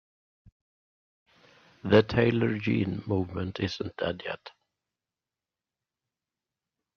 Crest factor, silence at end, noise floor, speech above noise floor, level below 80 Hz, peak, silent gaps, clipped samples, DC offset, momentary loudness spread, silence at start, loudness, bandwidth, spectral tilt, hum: 26 dB; 2.45 s; under -90 dBFS; over 63 dB; -60 dBFS; -6 dBFS; none; under 0.1%; under 0.1%; 14 LU; 1.85 s; -28 LUFS; 6.8 kHz; -7.5 dB/octave; none